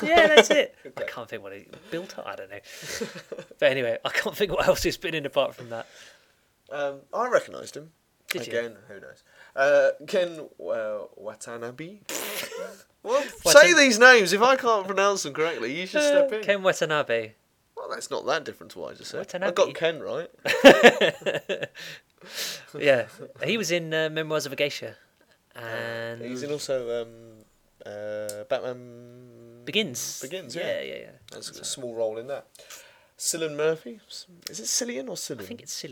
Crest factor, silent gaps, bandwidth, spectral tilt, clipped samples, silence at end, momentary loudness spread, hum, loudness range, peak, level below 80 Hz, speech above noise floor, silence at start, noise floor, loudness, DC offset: 26 dB; none; 19 kHz; -2.5 dB/octave; under 0.1%; 0 s; 23 LU; none; 14 LU; 0 dBFS; -58 dBFS; 39 dB; 0 s; -64 dBFS; -23 LUFS; under 0.1%